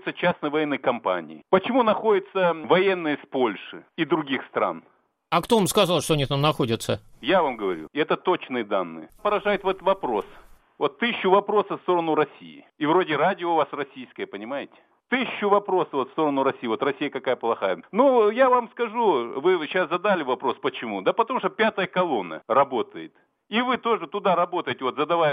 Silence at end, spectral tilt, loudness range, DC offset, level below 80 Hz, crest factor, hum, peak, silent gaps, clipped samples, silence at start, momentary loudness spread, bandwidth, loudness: 0 s; -5 dB/octave; 3 LU; under 0.1%; -58 dBFS; 20 dB; none; -4 dBFS; none; under 0.1%; 0.05 s; 9 LU; 16 kHz; -24 LUFS